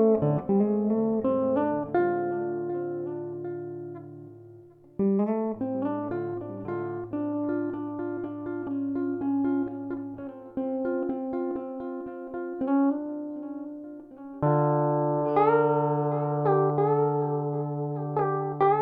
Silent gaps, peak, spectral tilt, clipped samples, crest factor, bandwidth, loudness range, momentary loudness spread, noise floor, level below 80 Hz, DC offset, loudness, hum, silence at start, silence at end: none; -10 dBFS; -12 dB/octave; under 0.1%; 16 dB; 4.1 kHz; 7 LU; 13 LU; -51 dBFS; -64 dBFS; under 0.1%; -28 LUFS; none; 0 s; 0 s